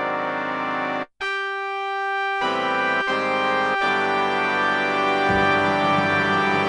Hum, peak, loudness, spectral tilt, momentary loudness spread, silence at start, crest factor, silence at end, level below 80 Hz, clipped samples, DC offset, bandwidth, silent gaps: none; -6 dBFS; -21 LUFS; -5 dB/octave; 7 LU; 0 s; 16 dB; 0 s; -54 dBFS; under 0.1%; under 0.1%; 11.5 kHz; none